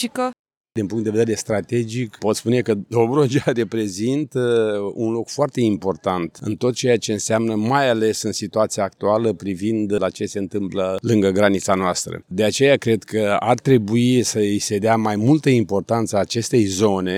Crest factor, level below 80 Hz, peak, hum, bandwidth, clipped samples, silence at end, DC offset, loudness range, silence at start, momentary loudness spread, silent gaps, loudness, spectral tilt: 16 dB; -60 dBFS; -2 dBFS; none; 16.5 kHz; under 0.1%; 0 s; under 0.1%; 3 LU; 0 s; 7 LU; 0.39-0.45 s, 0.57-0.64 s; -20 LUFS; -5.5 dB/octave